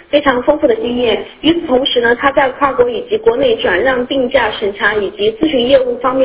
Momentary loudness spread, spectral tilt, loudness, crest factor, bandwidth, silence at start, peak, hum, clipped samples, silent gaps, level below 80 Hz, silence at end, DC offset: 4 LU; -8.5 dB/octave; -13 LUFS; 12 dB; 4 kHz; 0.1 s; 0 dBFS; none; under 0.1%; none; -42 dBFS; 0 s; under 0.1%